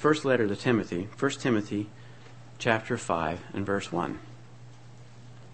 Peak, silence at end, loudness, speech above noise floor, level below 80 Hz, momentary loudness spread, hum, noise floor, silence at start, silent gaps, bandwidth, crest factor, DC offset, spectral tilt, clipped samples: -6 dBFS; 0 s; -29 LUFS; 22 dB; -60 dBFS; 24 LU; none; -50 dBFS; 0 s; none; 8.8 kHz; 24 dB; 0.3%; -5.5 dB/octave; under 0.1%